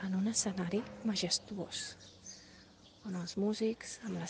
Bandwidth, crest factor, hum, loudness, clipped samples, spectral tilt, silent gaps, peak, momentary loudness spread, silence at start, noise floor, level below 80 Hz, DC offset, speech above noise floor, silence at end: 10 kHz; 18 dB; none; -37 LUFS; under 0.1%; -4 dB/octave; none; -20 dBFS; 17 LU; 0 s; -59 dBFS; -70 dBFS; under 0.1%; 22 dB; 0 s